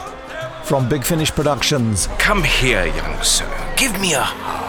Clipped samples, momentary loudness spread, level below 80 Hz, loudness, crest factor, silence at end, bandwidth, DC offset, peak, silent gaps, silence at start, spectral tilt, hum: under 0.1%; 7 LU; -26 dBFS; -17 LUFS; 16 dB; 0 s; 19.5 kHz; under 0.1%; -2 dBFS; none; 0 s; -3 dB/octave; none